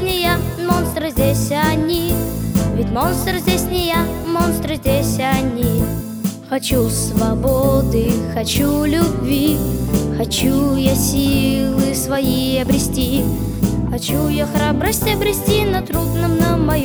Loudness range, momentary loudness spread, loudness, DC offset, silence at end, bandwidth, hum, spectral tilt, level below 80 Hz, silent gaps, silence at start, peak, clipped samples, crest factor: 2 LU; 4 LU; -17 LUFS; under 0.1%; 0 s; over 20 kHz; none; -5.5 dB/octave; -28 dBFS; none; 0 s; -2 dBFS; under 0.1%; 14 dB